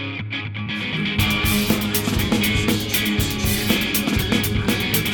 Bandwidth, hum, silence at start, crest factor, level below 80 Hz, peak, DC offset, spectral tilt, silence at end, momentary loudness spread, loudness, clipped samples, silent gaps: over 20 kHz; none; 0 s; 16 dB; -34 dBFS; -6 dBFS; under 0.1%; -4 dB/octave; 0 s; 7 LU; -20 LUFS; under 0.1%; none